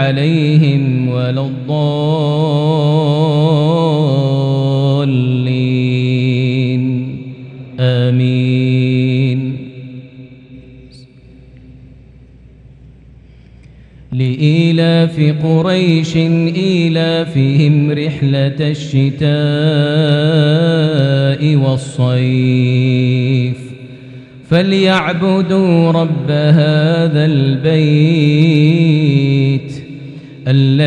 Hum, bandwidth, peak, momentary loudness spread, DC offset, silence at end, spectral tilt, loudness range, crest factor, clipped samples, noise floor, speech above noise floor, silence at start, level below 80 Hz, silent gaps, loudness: none; 9 kHz; 0 dBFS; 8 LU; under 0.1%; 0 s; -8 dB/octave; 5 LU; 12 dB; under 0.1%; -40 dBFS; 28 dB; 0 s; -48 dBFS; none; -13 LUFS